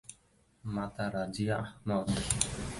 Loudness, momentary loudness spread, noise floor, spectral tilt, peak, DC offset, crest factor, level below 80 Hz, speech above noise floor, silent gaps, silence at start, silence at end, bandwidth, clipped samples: -34 LUFS; 8 LU; -67 dBFS; -4.5 dB/octave; -10 dBFS; under 0.1%; 24 dB; -50 dBFS; 34 dB; none; 0.1 s; 0 s; 12 kHz; under 0.1%